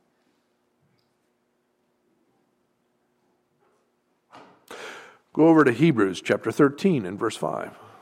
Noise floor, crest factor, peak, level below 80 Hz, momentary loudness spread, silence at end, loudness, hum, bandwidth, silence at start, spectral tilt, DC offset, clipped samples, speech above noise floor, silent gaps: -71 dBFS; 20 dB; -6 dBFS; -72 dBFS; 23 LU; 0.3 s; -22 LUFS; none; 13.5 kHz; 4.7 s; -7 dB/octave; under 0.1%; under 0.1%; 50 dB; none